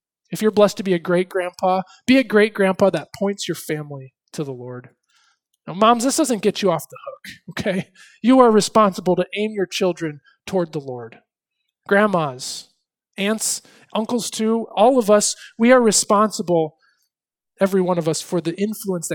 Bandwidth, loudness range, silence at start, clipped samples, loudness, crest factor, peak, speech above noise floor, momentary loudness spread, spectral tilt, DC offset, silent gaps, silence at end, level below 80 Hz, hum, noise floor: 19 kHz; 6 LU; 0.3 s; under 0.1%; -19 LUFS; 20 dB; 0 dBFS; 64 dB; 18 LU; -4.5 dB/octave; under 0.1%; none; 0 s; -62 dBFS; none; -83 dBFS